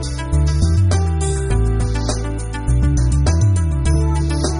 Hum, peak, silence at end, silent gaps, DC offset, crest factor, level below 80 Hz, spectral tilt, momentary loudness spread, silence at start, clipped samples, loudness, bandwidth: none; -4 dBFS; 0 s; none; under 0.1%; 12 dB; -20 dBFS; -6 dB/octave; 5 LU; 0 s; under 0.1%; -18 LUFS; 11 kHz